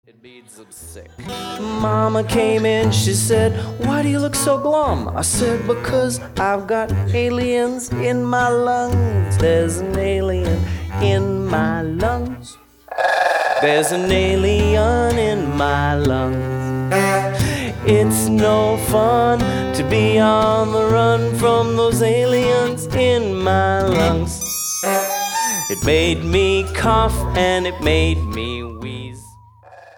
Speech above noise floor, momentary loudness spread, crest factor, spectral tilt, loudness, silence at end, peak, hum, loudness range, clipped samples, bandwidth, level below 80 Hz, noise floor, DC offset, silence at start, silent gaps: 27 dB; 7 LU; 14 dB; -5 dB/octave; -17 LUFS; 0.15 s; -2 dBFS; none; 3 LU; under 0.1%; 19.5 kHz; -32 dBFS; -44 dBFS; under 0.1%; 0.25 s; none